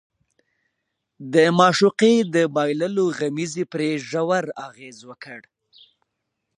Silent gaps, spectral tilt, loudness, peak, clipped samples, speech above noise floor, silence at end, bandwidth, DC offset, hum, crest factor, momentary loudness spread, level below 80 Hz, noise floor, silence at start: none; -5 dB/octave; -20 LUFS; -2 dBFS; under 0.1%; 58 dB; 1.2 s; 11 kHz; under 0.1%; none; 20 dB; 24 LU; -72 dBFS; -78 dBFS; 1.2 s